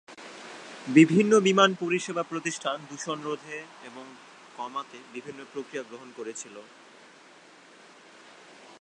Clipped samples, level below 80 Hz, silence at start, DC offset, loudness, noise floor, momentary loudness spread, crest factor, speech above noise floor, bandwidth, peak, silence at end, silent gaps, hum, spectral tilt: under 0.1%; -80 dBFS; 0.1 s; under 0.1%; -25 LUFS; -53 dBFS; 25 LU; 24 dB; 26 dB; 10 kHz; -4 dBFS; 2.2 s; none; none; -5 dB/octave